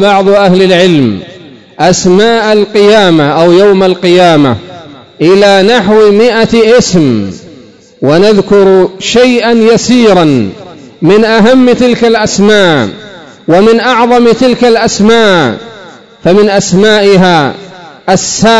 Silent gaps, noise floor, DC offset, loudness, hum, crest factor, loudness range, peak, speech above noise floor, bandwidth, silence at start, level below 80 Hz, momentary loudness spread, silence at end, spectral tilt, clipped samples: none; -34 dBFS; 1%; -6 LUFS; none; 6 dB; 1 LU; 0 dBFS; 29 dB; 11 kHz; 0 s; -38 dBFS; 8 LU; 0 s; -5 dB/octave; 10%